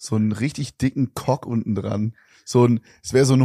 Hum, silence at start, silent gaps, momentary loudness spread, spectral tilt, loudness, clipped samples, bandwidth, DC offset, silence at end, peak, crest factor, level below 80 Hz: none; 0 s; none; 8 LU; -6.5 dB/octave; -22 LUFS; under 0.1%; 14.5 kHz; under 0.1%; 0 s; -4 dBFS; 16 dB; -52 dBFS